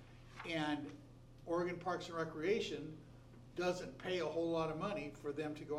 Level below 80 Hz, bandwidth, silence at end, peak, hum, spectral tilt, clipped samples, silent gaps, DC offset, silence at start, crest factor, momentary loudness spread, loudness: -66 dBFS; 13.5 kHz; 0 s; -24 dBFS; none; -5.5 dB/octave; under 0.1%; none; under 0.1%; 0 s; 18 dB; 18 LU; -41 LUFS